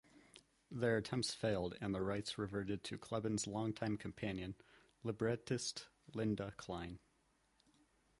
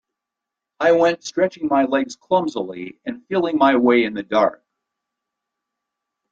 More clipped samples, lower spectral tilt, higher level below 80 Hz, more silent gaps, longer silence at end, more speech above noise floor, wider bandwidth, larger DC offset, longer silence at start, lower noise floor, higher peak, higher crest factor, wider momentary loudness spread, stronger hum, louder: neither; about the same, -5 dB/octave vs -5 dB/octave; about the same, -66 dBFS vs -64 dBFS; neither; second, 1.25 s vs 1.75 s; second, 36 dB vs 66 dB; first, 11.5 kHz vs 7.8 kHz; neither; second, 0.15 s vs 0.8 s; second, -77 dBFS vs -84 dBFS; second, -24 dBFS vs -2 dBFS; about the same, 20 dB vs 18 dB; about the same, 11 LU vs 13 LU; neither; second, -42 LUFS vs -19 LUFS